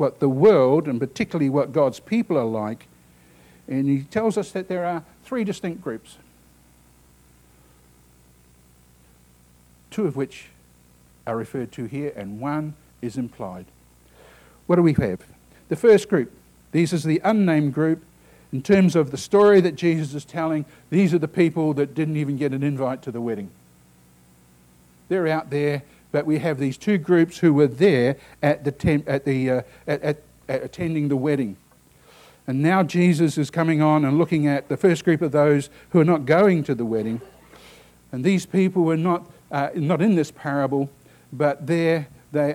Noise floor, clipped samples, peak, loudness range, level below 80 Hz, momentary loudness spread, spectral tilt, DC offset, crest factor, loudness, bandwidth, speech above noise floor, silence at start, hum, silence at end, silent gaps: -54 dBFS; under 0.1%; -6 dBFS; 11 LU; -56 dBFS; 14 LU; -7.5 dB/octave; under 0.1%; 16 dB; -22 LUFS; 15.5 kHz; 34 dB; 0 s; 60 Hz at -50 dBFS; 0 s; none